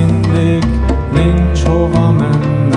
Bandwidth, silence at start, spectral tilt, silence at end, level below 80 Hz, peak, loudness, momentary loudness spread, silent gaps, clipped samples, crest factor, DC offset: 10.5 kHz; 0 s; -8 dB/octave; 0 s; -18 dBFS; 0 dBFS; -12 LUFS; 3 LU; none; under 0.1%; 10 dB; under 0.1%